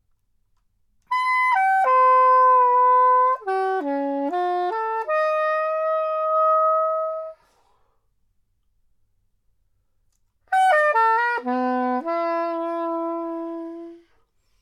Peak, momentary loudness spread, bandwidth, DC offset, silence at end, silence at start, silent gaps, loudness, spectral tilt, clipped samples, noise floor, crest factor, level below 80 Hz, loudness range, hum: -8 dBFS; 12 LU; 11 kHz; under 0.1%; 0.65 s; 1.1 s; none; -20 LUFS; -3 dB/octave; under 0.1%; -66 dBFS; 14 dB; -70 dBFS; 9 LU; none